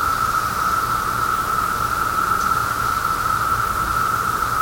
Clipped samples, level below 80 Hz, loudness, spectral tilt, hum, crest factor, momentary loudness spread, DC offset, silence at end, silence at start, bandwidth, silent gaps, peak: under 0.1%; -38 dBFS; -19 LUFS; -3 dB/octave; none; 12 dB; 1 LU; under 0.1%; 0 s; 0 s; over 20 kHz; none; -8 dBFS